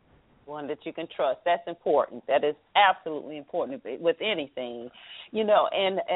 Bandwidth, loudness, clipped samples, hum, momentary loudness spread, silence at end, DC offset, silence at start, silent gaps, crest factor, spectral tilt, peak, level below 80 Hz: 4 kHz; -27 LUFS; under 0.1%; none; 15 LU; 0 s; under 0.1%; 0.45 s; none; 20 dB; -1 dB/octave; -8 dBFS; -70 dBFS